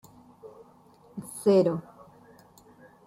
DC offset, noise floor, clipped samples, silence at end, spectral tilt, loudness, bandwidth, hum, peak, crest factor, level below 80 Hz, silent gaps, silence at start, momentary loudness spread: under 0.1%; -57 dBFS; under 0.1%; 1.25 s; -7 dB/octave; -25 LUFS; 15 kHz; none; -12 dBFS; 18 dB; -70 dBFS; none; 0.45 s; 28 LU